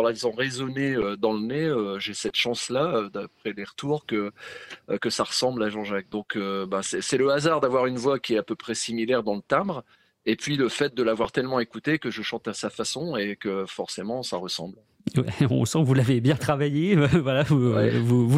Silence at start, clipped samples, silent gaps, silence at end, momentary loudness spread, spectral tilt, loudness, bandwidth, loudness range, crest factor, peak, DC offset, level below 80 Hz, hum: 0 s; under 0.1%; none; 0 s; 11 LU; -5.5 dB/octave; -25 LUFS; 14.5 kHz; 6 LU; 18 dB; -8 dBFS; under 0.1%; -58 dBFS; none